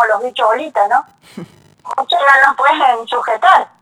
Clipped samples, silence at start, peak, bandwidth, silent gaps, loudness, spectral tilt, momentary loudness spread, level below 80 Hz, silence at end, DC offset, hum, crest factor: under 0.1%; 0 s; 0 dBFS; 14 kHz; none; -12 LUFS; -2.5 dB/octave; 9 LU; -66 dBFS; 0.15 s; under 0.1%; none; 14 dB